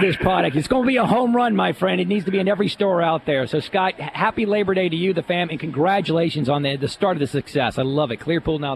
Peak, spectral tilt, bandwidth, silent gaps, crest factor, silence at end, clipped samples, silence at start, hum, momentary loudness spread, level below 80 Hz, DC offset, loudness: -4 dBFS; -6.5 dB/octave; 13 kHz; none; 16 dB; 0 s; under 0.1%; 0 s; none; 5 LU; -48 dBFS; under 0.1%; -20 LUFS